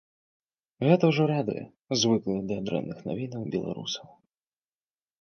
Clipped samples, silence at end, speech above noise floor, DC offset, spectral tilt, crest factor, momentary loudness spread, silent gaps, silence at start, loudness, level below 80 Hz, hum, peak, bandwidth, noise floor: under 0.1%; 1.2 s; over 63 dB; under 0.1%; -5.5 dB/octave; 22 dB; 12 LU; 1.81-1.85 s; 0.8 s; -28 LUFS; -64 dBFS; none; -6 dBFS; 6.8 kHz; under -90 dBFS